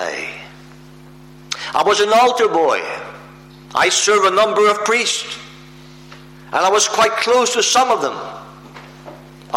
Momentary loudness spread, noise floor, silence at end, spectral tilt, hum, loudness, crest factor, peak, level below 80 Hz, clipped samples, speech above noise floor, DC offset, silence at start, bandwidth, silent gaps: 19 LU; -41 dBFS; 0 s; -1 dB/octave; none; -15 LUFS; 14 dB; -4 dBFS; -56 dBFS; under 0.1%; 26 dB; under 0.1%; 0 s; 16.5 kHz; none